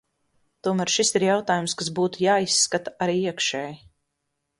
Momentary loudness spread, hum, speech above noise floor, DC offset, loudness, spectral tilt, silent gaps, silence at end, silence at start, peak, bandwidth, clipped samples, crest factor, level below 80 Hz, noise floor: 7 LU; none; 55 dB; under 0.1%; -23 LUFS; -3 dB/octave; none; 0.85 s; 0.65 s; -8 dBFS; 11.5 kHz; under 0.1%; 18 dB; -66 dBFS; -78 dBFS